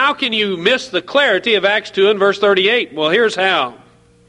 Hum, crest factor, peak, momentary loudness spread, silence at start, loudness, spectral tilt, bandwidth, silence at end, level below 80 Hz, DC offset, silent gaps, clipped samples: none; 16 dB; 0 dBFS; 4 LU; 0 s; -14 LUFS; -3.5 dB/octave; 10.5 kHz; 0.55 s; -60 dBFS; under 0.1%; none; under 0.1%